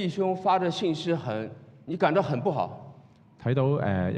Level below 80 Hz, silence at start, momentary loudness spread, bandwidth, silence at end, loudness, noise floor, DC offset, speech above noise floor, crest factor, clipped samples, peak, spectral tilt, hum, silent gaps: -68 dBFS; 0 s; 12 LU; 9.4 kHz; 0 s; -27 LUFS; -54 dBFS; under 0.1%; 28 dB; 18 dB; under 0.1%; -10 dBFS; -7.5 dB/octave; none; none